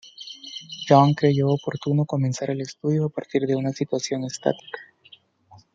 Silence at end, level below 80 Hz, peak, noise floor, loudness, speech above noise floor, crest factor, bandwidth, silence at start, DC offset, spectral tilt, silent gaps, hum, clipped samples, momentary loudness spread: 0.9 s; -68 dBFS; -2 dBFS; -54 dBFS; -23 LUFS; 32 dB; 22 dB; 7.8 kHz; 0.05 s; under 0.1%; -6.5 dB/octave; none; none; under 0.1%; 18 LU